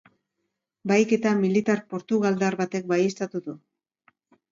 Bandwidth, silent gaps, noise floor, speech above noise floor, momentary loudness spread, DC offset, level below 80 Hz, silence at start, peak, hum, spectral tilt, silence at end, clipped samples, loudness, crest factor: 7.6 kHz; none; -80 dBFS; 57 dB; 13 LU; under 0.1%; -72 dBFS; 0.85 s; -8 dBFS; none; -6 dB/octave; 0.95 s; under 0.1%; -24 LUFS; 18 dB